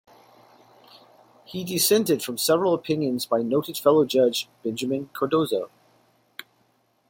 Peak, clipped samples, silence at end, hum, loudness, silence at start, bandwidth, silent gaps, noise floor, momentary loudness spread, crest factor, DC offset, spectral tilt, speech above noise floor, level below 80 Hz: -6 dBFS; under 0.1%; 1.45 s; none; -23 LUFS; 1.5 s; 17 kHz; none; -66 dBFS; 18 LU; 20 dB; under 0.1%; -4 dB/octave; 43 dB; -70 dBFS